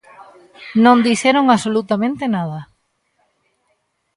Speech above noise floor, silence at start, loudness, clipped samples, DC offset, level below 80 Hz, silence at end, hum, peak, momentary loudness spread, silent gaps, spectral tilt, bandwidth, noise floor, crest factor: 52 dB; 0.2 s; -15 LUFS; under 0.1%; under 0.1%; -62 dBFS; 1.5 s; none; 0 dBFS; 14 LU; none; -5 dB/octave; 11.5 kHz; -67 dBFS; 18 dB